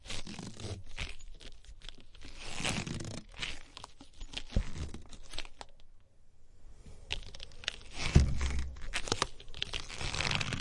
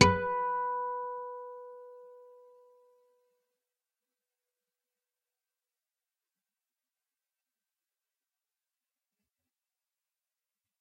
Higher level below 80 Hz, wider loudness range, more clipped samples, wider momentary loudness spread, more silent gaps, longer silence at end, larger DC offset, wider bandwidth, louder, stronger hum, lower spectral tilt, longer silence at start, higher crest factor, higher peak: first, -42 dBFS vs -62 dBFS; second, 10 LU vs 22 LU; neither; about the same, 21 LU vs 21 LU; neither; second, 0 s vs 8.55 s; neither; about the same, 11.5 kHz vs 11 kHz; second, -37 LUFS vs -32 LUFS; neither; about the same, -4 dB/octave vs -4 dB/octave; about the same, 0 s vs 0 s; about the same, 30 dB vs 34 dB; second, -8 dBFS vs -4 dBFS